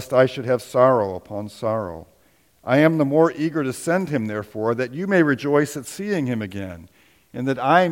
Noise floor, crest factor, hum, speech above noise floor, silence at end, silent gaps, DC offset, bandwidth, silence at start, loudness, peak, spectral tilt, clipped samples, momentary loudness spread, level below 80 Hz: -59 dBFS; 20 dB; none; 39 dB; 0 s; none; under 0.1%; 17 kHz; 0 s; -21 LUFS; -2 dBFS; -6.5 dB/octave; under 0.1%; 15 LU; -60 dBFS